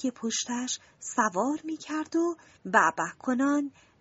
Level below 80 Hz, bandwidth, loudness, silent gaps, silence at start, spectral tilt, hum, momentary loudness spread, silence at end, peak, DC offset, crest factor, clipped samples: -74 dBFS; 8 kHz; -28 LUFS; none; 0 s; -2.5 dB/octave; none; 11 LU; 0.3 s; -6 dBFS; under 0.1%; 22 dB; under 0.1%